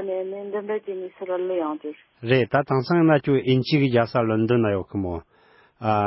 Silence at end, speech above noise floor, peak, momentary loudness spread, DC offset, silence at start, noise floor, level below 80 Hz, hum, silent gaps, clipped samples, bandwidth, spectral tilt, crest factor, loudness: 0 s; 31 dB; -6 dBFS; 13 LU; under 0.1%; 0 s; -53 dBFS; -52 dBFS; none; none; under 0.1%; 5.8 kHz; -11.5 dB/octave; 16 dB; -23 LUFS